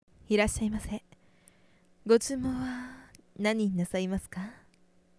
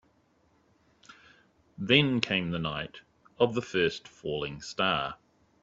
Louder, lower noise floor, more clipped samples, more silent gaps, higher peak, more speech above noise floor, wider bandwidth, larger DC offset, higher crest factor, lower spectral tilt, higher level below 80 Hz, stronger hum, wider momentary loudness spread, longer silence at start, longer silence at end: about the same, -30 LUFS vs -29 LUFS; about the same, -65 dBFS vs -67 dBFS; neither; neither; second, -10 dBFS vs -6 dBFS; about the same, 36 dB vs 38 dB; first, 11 kHz vs 7.8 kHz; neither; about the same, 22 dB vs 26 dB; about the same, -5 dB/octave vs -5 dB/octave; first, -50 dBFS vs -62 dBFS; neither; first, 18 LU vs 15 LU; second, 0.3 s vs 1.1 s; first, 0.65 s vs 0.5 s